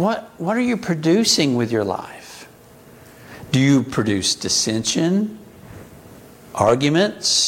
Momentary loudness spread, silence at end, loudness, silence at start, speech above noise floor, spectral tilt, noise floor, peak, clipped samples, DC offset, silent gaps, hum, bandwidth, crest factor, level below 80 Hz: 18 LU; 0 s; -19 LUFS; 0 s; 27 dB; -4 dB/octave; -45 dBFS; -2 dBFS; under 0.1%; under 0.1%; none; none; 17 kHz; 18 dB; -54 dBFS